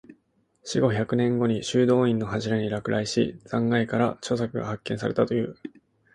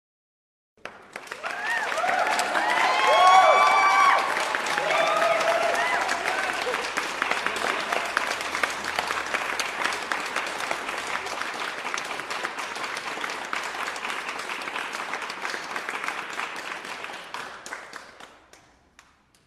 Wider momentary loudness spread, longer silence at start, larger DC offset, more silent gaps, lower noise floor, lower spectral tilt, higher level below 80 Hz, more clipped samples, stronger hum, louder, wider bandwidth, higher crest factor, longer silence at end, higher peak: second, 9 LU vs 17 LU; second, 0.1 s vs 0.85 s; neither; neither; first, -68 dBFS vs -58 dBFS; first, -6 dB/octave vs -1 dB/octave; first, -58 dBFS vs -66 dBFS; neither; neither; about the same, -25 LUFS vs -24 LUFS; second, 10.5 kHz vs 15.5 kHz; about the same, 18 dB vs 22 dB; second, 0.45 s vs 1.2 s; second, -8 dBFS vs -4 dBFS